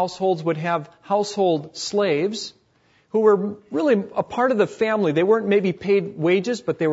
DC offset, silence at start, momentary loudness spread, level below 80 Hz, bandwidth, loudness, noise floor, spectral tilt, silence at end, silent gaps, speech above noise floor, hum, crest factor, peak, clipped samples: under 0.1%; 0 s; 8 LU; -66 dBFS; 8 kHz; -21 LUFS; -61 dBFS; -5.5 dB/octave; 0 s; none; 40 dB; none; 16 dB; -4 dBFS; under 0.1%